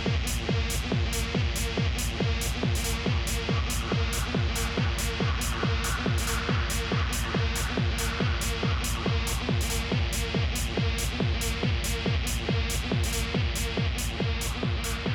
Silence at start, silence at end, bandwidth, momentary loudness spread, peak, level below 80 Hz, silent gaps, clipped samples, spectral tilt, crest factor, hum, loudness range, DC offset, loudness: 0 s; 0 s; 19.5 kHz; 1 LU; -14 dBFS; -32 dBFS; none; under 0.1%; -4 dB/octave; 12 dB; none; 0 LU; under 0.1%; -28 LUFS